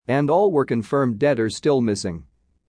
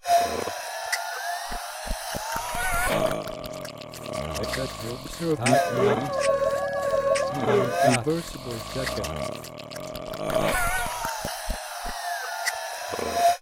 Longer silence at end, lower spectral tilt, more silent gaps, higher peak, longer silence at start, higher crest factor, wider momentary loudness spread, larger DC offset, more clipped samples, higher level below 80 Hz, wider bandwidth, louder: first, 0.45 s vs 0 s; first, -6.5 dB/octave vs -4 dB/octave; neither; about the same, -6 dBFS vs -6 dBFS; about the same, 0.1 s vs 0.05 s; second, 14 dB vs 20 dB; second, 9 LU vs 12 LU; neither; neither; second, -54 dBFS vs -42 dBFS; second, 10.5 kHz vs 17 kHz; first, -20 LUFS vs -27 LUFS